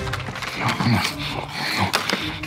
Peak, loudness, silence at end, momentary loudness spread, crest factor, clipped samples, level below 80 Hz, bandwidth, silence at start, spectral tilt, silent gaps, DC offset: -4 dBFS; -23 LUFS; 0 s; 7 LU; 20 dB; under 0.1%; -44 dBFS; 16 kHz; 0 s; -4 dB/octave; none; under 0.1%